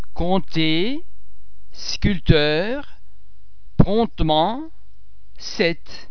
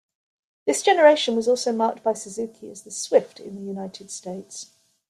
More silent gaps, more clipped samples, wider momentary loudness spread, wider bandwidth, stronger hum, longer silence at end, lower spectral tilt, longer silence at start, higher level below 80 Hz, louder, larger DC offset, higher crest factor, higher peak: neither; neither; second, 15 LU vs 20 LU; second, 5.4 kHz vs 13.5 kHz; neither; second, 0 s vs 0.45 s; first, -6 dB/octave vs -3 dB/octave; second, 0 s vs 0.65 s; first, -30 dBFS vs -72 dBFS; about the same, -21 LUFS vs -21 LUFS; first, 5% vs under 0.1%; about the same, 22 dB vs 20 dB; first, 0 dBFS vs -4 dBFS